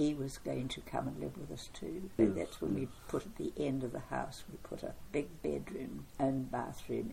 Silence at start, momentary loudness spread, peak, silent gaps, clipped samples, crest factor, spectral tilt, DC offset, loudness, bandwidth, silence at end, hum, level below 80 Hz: 0 s; 12 LU; -16 dBFS; none; under 0.1%; 22 dB; -6.5 dB/octave; under 0.1%; -39 LUFS; 16.5 kHz; 0 s; none; -56 dBFS